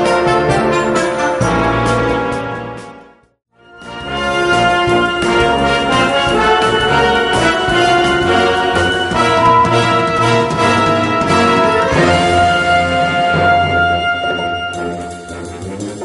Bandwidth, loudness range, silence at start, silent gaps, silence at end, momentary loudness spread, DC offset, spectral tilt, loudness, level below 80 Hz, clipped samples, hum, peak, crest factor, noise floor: 11.5 kHz; 5 LU; 0 s; none; 0 s; 12 LU; under 0.1%; -5 dB/octave; -13 LUFS; -34 dBFS; under 0.1%; none; 0 dBFS; 14 dB; -41 dBFS